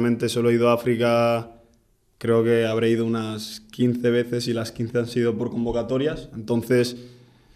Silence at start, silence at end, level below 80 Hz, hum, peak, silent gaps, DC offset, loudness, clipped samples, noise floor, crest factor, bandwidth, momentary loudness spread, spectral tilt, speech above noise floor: 0 s; 0.45 s; -52 dBFS; none; -6 dBFS; none; under 0.1%; -23 LUFS; under 0.1%; -62 dBFS; 16 dB; 15 kHz; 9 LU; -6.5 dB/octave; 39 dB